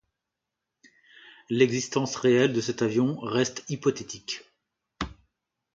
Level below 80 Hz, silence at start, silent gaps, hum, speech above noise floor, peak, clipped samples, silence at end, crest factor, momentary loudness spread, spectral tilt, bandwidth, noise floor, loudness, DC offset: -56 dBFS; 1.25 s; none; none; 60 dB; -8 dBFS; under 0.1%; 0.6 s; 20 dB; 15 LU; -5 dB/octave; 7.8 kHz; -85 dBFS; -27 LUFS; under 0.1%